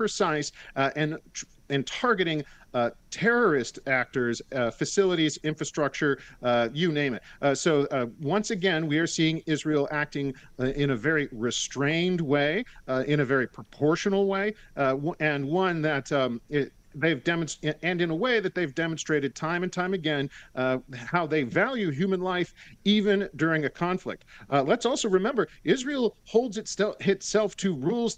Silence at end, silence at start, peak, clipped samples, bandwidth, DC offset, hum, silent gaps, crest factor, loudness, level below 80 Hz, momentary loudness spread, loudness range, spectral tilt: 0 s; 0 s; -8 dBFS; under 0.1%; 10 kHz; under 0.1%; none; none; 20 dB; -27 LUFS; -56 dBFS; 6 LU; 2 LU; -5 dB/octave